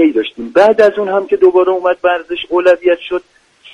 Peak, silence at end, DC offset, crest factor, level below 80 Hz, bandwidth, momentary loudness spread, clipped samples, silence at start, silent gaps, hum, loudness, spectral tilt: 0 dBFS; 0.55 s; under 0.1%; 12 dB; -54 dBFS; 8 kHz; 9 LU; under 0.1%; 0 s; none; none; -12 LUFS; -5.5 dB/octave